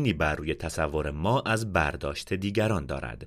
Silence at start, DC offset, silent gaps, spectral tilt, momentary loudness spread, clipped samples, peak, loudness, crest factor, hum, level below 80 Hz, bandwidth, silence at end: 0 s; under 0.1%; none; -5.5 dB/octave; 6 LU; under 0.1%; -8 dBFS; -28 LUFS; 20 dB; none; -42 dBFS; 15.5 kHz; 0 s